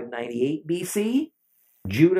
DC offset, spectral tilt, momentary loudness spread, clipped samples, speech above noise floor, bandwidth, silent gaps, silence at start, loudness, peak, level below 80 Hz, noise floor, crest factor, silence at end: under 0.1%; -6 dB/octave; 11 LU; under 0.1%; 42 dB; 16 kHz; none; 0 s; -26 LUFS; -6 dBFS; -68 dBFS; -64 dBFS; 20 dB; 0 s